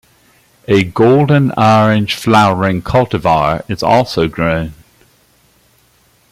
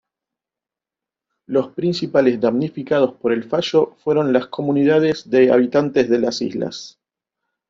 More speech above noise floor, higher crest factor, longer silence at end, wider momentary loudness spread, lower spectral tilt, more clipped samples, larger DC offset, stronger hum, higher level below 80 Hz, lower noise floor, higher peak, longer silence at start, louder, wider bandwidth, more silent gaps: second, 41 dB vs 71 dB; about the same, 14 dB vs 18 dB; first, 1.6 s vs 0.8 s; about the same, 7 LU vs 8 LU; about the same, -6.5 dB/octave vs -6.5 dB/octave; neither; neither; neither; first, -40 dBFS vs -60 dBFS; second, -53 dBFS vs -88 dBFS; about the same, 0 dBFS vs -2 dBFS; second, 0.7 s vs 1.5 s; first, -12 LUFS vs -18 LUFS; first, 15.5 kHz vs 7.6 kHz; neither